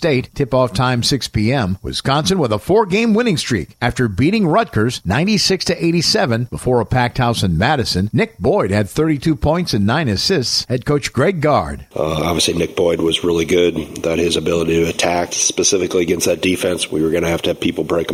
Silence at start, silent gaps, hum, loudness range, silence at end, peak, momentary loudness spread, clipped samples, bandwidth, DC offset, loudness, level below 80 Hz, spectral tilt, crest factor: 0 s; none; none; 1 LU; 0 s; -2 dBFS; 4 LU; under 0.1%; 16 kHz; under 0.1%; -16 LUFS; -38 dBFS; -4.5 dB/octave; 14 dB